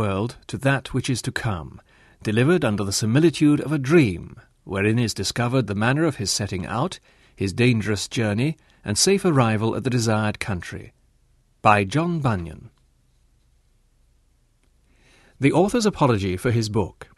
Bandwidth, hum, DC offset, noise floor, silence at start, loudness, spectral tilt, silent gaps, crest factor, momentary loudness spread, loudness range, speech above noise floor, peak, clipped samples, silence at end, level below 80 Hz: 12.5 kHz; none; under 0.1%; -62 dBFS; 0 s; -22 LUFS; -5.5 dB/octave; none; 22 dB; 11 LU; 4 LU; 40 dB; -2 dBFS; under 0.1%; 0.15 s; -50 dBFS